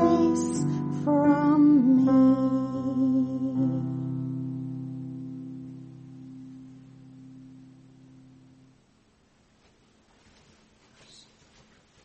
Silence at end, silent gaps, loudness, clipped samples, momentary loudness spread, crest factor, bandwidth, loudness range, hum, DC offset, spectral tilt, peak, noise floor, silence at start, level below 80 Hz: 4.55 s; none; -24 LUFS; under 0.1%; 25 LU; 18 dB; 8.4 kHz; 23 LU; none; under 0.1%; -8 dB/octave; -8 dBFS; -63 dBFS; 0 s; -64 dBFS